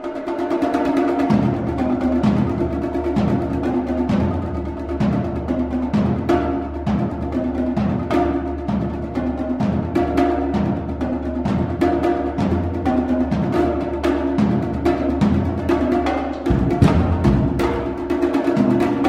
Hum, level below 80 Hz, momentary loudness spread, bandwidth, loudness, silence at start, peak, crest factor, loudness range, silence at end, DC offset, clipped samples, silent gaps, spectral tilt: none; -32 dBFS; 6 LU; 11.5 kHz; -20 LUFS; 0 s; -2 dBFS; 18 dB; 3 LU; 0 s; under 0.1%; under 0.1%; none; -8.5 dB/octave